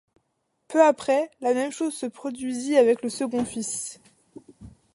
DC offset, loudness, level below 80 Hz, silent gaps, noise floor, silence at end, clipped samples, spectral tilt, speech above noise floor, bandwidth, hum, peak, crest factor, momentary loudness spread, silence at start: under 0.1%; -24 LUFS; -64 dBFS; none; -74 dBFS; 0.25 s; under 0.1%; -3.5 dB/octave; 51 dB; 11.5 kHz; none; -6 dBFS; 20 dB; 12 LU; 0.7 s